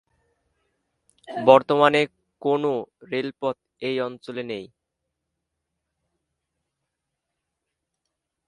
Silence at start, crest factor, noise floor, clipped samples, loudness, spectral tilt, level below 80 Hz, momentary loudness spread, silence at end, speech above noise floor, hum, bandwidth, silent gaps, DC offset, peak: 1.3 s; 26 dB; -82 dBFS; under 0.1%; -22 LUFS; -6 dB/octave; -72 dBFS; 16 LU; 3.8 s; 60 dB; none; 10 kHz; none; under 0.1%; 0 dBFS